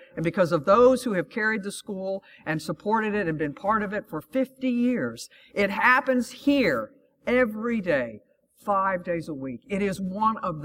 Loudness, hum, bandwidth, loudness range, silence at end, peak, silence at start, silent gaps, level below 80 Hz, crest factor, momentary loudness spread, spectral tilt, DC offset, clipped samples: -25 LUFS; none; 16.5 kHz; 3 LU; 0 s; -6 dBFS; 0 s; none; -58 dBFS; 20 dB; 13 LU; -6 dB/octave; under 0.1%; under 0.1%